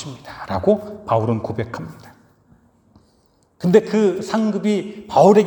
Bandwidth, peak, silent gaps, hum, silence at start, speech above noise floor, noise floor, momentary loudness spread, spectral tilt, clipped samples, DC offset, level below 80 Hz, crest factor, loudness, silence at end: over 20 kHz; 0 dBFS; none; none; 0 s; 41 dB; -59 dBFS; 16 LU; -7 dB/octave; under 0.1%; under 0.1%; -56 dBFS; 20 dB; -19 LUFS; 0 s